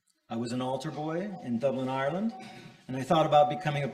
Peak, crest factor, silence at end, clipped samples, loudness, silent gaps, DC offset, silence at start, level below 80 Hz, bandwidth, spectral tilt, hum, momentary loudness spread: -10 dBFS; 20 dB; 0 s; under 0.1%; -30 LUFS; none; under 0.1%; 0.3 s; -66 dBFS; 13.5 kHz; -6.5 dB/octave; none; 16 LU